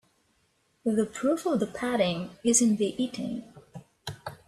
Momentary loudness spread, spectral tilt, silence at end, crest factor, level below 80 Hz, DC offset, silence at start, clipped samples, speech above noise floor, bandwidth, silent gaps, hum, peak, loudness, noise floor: 18 LU; -4 dB/octave; 0.15 s; 20 dB; -66 dBFS; under 0.1%; 0.85 s; under 0.1%; 43 dB; 13.5 kHz; none; none; -8 dBFS; -27 LUFS; -70 dBFS